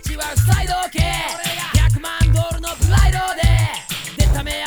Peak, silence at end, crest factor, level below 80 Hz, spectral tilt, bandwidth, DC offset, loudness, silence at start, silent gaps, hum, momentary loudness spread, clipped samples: -2 dBFS; 0 s; 14 dB; -20 dBFS; -4.5 dB/octave; over 20 kHz; under 0.1%; -18 LUFS; 0 s; none; none; 6 LU; under 0.1%